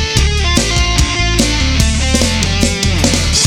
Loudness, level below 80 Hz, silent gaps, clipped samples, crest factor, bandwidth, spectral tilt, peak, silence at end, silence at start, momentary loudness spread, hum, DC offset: -12 LUFS; -16 dBFS; none; under 0.1%; 12 dB; 18 kHz; -3.5 dB/octave; 0 dBFS; 0 s; 0 s; 1 LU; none; under 0.1%